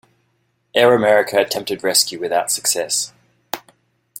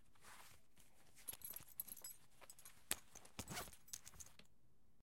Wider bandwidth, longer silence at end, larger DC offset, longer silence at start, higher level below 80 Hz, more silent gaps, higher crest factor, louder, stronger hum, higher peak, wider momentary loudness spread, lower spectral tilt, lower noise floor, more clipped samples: about the same, 17 kHz vs 17 kHz; first, 0.6 s vs 0.1 s; neither; first, 0.75 s vs 0 s; first, -62 dBFS vs -74 dBFS; neither; second, 18 dB vs 40 dB; first, -17 LUFS vs -53 LUFS; neither; first, -2 dBFS vs -18 dBFS; about the same, 17 LU vs 16 LU; about the same, -1.5 dB/octave vs -1.5 dB/octave; second, -66 dBFS vs -78 dBFS; neither